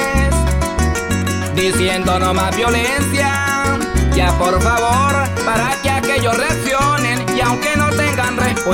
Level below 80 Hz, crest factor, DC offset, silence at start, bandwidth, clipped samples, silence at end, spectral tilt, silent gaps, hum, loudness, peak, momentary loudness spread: -24 dBFS; 12 dB; under 0.1%; 0 s; 17.5 kHz; under 0.1%; 0 s; -4.5 dB/octave; none; none; -15 LUFS; -2 dBFS; 3 LU